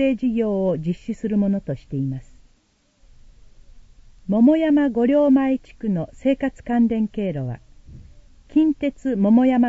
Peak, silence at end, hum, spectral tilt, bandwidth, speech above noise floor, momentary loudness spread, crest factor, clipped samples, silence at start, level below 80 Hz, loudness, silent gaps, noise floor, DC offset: -6 dBFS; 0 s; none; -9 dB/octave; 7.8 kHz; 42 dB; 11 LU; 14 dB; under 0.1%; 0 s; -48 dBFS; -21 LUFS; none; -61 dBFS; under 0.1%